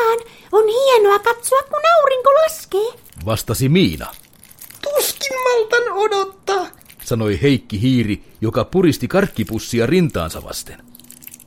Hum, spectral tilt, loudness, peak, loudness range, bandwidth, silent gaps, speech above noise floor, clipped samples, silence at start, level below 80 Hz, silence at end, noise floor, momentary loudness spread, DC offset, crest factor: none; -5 dB/octave; -17 LUFS; 0 dBFS; 4 LU; 17 kHz; none; 25 dB; under 0.1%; 0 s; -42 dBFS; 0.1 s; -42 dBFS; 16 LU; 0.1%; 16 dB